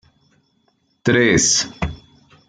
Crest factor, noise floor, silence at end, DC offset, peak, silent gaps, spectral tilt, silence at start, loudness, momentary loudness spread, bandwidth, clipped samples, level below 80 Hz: 18 dB; -64 dBFS; 0.5 s; under 0.1%; -2 dBFS; none; -3 dB/octave; 1.05 s; -17 LUFS; 14 LU; 11 kHz; under 0.1%; -42 dBFS